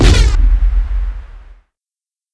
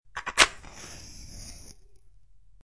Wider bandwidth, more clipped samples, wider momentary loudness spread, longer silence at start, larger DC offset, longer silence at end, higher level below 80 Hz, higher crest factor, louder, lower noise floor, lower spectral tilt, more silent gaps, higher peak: about the same, 11 kHz vs 11 kHz; neither; second, 14 LU vs 23 LU; second, 0 s vs 0.15 s; second, under 0.1% vs 0.3%; about the same, 0.95 s vs 0.95 s; first, -14 dBFS vs -50 dBFS; second, 12 dB vs 32 dB; first, -16 LUFS vs -23 LUFS; first, under -90 dBFS vs -58 dBFS; first, -5 dB/octave vs 0 dB/octave; neither; about the same, 0 dBFS vs 0 dBFS